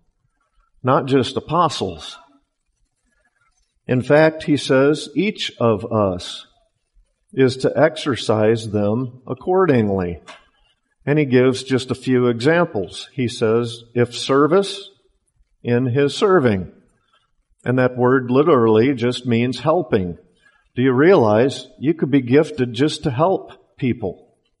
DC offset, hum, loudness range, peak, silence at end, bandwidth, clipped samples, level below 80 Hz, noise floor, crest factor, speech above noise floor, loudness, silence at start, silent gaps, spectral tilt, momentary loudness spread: under 0.1%; none; 3 LU; -2 dBFS; 0.45 s; 11.5 kHz; under 0.1%; -54 dBFS; -68 dBFS; 16 dB; 51 dB; -18 LUFS; 0.85 s; none; -6.5 dB/octave; 13 LU